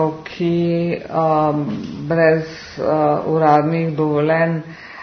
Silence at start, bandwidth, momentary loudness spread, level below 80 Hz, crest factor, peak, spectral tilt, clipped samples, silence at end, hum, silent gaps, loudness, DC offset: 0 s; 6.4 kHz; 10 LU; -54 dBFS; 18 dB; 0 dBFS; -8.5 dB/octave; under 0.1%; 0 s; none; none; -18 LUFS; under 0.1%